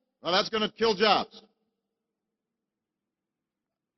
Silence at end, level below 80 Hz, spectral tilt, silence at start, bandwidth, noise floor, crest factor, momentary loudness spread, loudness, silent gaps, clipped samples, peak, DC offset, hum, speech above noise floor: 2.6 s; -68 dBFS; -4 dB/octave; 0.25 s; 6.4 kHz; -88 dBFS; 24 dB; 6 LU; -26 LUFS; none; under 0.1%; -6 dBFS; under 0.1%; none; 62 dB